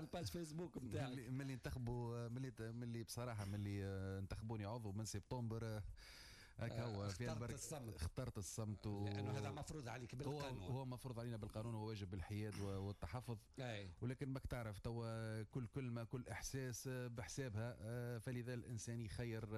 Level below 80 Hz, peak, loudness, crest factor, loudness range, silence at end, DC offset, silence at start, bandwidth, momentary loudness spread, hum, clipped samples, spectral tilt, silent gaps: -62 dBFS; -36 dBFS; -49 LUFS; 12 dB; 1 LU; 0 s; under 0.1%; 0 s; 13 kHz; 3 LU; none; under 0.1%; -6 dB/octave; none